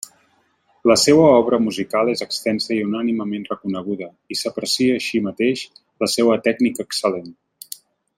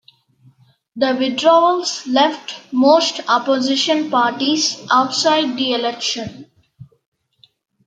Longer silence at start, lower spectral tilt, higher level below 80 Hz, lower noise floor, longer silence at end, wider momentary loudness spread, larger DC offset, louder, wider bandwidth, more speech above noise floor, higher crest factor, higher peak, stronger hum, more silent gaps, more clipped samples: about the same, 0.85 s vs 0.95 s; first, -4 dB/octave vs -2.5 dB/octave; first, -62 dBFS vs -68 dBFS; first, -61 dBFS vs -56 dBFS; second, 0.85 s vs 1 s; first, 16 LU vs 8 LU; neither; second, -19 LUFS vs -16 LUFS; first, 16 kHz vs 9.4 kHz; about the same, 43 dB vs 40 dB; about the same, 18 dB vs 16 dB; about the same, -2 dBFS vs -2 dBFS; neither; neither; neither